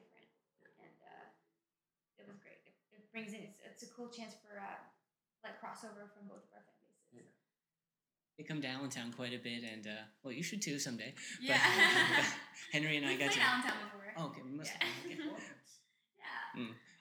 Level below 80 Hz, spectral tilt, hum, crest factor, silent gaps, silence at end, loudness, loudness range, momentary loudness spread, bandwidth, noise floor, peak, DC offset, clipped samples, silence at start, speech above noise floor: under -90 dBFS; -2.5 dB/octave; none; 26 dB; none; 0.2 s; -36 LUFS; 24 LU; 24 LU; over 20 kHz; under -90 dBFS; -14 dBFS; under 0.1%; under 0.1%; 0.8 s; over 51 dB